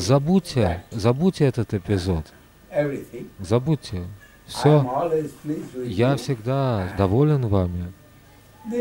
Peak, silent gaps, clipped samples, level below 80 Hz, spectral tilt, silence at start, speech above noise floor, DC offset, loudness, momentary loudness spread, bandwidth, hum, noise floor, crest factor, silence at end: -4 dBFS; none; under 0.1%; -46 dBFS; -7 dB/octave; 0 s; 28 dB; under 0.1%; -23 LUFS; 15 LU; 16 kHz; none; -50 dBFS; 18 dB; 0 s